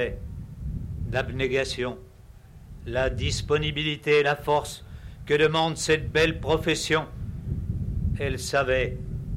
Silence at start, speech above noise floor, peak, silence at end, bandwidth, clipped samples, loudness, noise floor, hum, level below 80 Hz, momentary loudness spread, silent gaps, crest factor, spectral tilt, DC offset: 0 s; 23 dB; -12 dBFS; 0 s; 15.5 kHz; under 0.1%; -26 LUFS; -48 dBFS; none; -38 dBFS; 15 LU; none; 14 dB; -4.5 dB/octave; under 0.1%